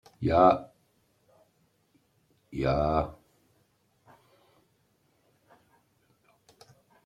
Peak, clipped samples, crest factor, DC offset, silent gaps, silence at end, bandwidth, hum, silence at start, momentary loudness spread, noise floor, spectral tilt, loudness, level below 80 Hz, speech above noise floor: -8 dBFS; under 0.1%; 26 dB; under 0.1%; none; 3.9 s; 11.5 kHz; none; 0.2 s; 14 LU; -70 dBFS; -8.5 dB/octave; -26 LUFS; -50 dBFS; 46 dB